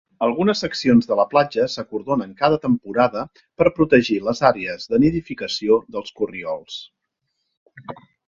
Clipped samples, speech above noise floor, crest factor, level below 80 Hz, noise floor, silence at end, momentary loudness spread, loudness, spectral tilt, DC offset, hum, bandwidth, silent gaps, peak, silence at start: under 0.1%; 56 dB; 20 dB; -52 dBFS; -76 dBFS; 0.35 s; 14 LU; -20 LUFS; -6 dB/octave; under 0.1%; none; 7.6 kHz; 7.57-7.66 s; 0 dBFS; 0.2 s